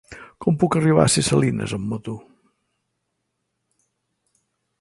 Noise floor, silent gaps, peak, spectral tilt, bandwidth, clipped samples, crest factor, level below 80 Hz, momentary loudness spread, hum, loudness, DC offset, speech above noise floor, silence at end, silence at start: -76 dBFS; none; -2 dBFS; -5 dB/octave; 11.5 kHz; under 0.1%; 22 dB; -50 dBFS; 18 LU; none; -20 LUFS; under 0.1%; 57 dB; 2.6 s; 0.1 s